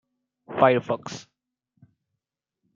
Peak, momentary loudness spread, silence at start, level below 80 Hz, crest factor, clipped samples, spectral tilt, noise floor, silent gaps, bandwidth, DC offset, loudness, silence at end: -2 dBFS; 19 LU; 0.5 s; -74 dBFS; 26 dB; under 0.1%; -6 dB/octave; -84 dBFS; none; 7.6 kHz; under 0.1%; -23 LUFS; 1.55 s